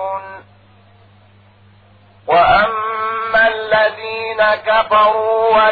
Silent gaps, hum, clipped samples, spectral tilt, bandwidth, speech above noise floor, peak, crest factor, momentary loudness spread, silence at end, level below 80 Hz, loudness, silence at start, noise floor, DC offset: none; none; under 0.1%; -6 dB/octave; 4.9 kHz; 35 dB; -2 dBFS; 14 dB; 12 LU; 0 s; -46 dBFS; -14 LUFS; 0 s; -47 dBFS; 0.1%